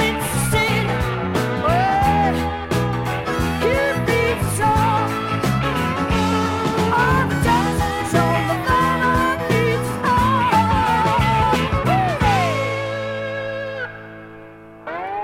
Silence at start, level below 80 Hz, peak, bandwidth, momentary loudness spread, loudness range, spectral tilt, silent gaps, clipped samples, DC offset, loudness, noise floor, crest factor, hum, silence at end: 0 s; -34 dBFS; -4 dBFS; 16.5 kHz; 9 LU; 2 LU; -5.5 dB/octave; none; under 0.1%; under 0.1%; -19 LUFS; -40 dBFS; 14 dB; none; 0 s